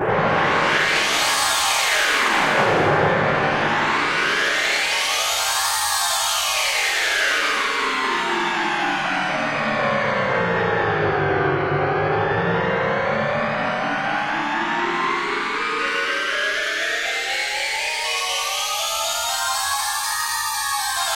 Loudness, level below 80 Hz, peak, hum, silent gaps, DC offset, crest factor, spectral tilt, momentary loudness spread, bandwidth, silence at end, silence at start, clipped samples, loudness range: -19 LUFS; -52 dBFS; -6 dBFS; none; none; 0.1%; 16 dB; -2 dB/octave; 4 LU; 16 kHz; 0 s; 0 s; under 0.1%; 4 LU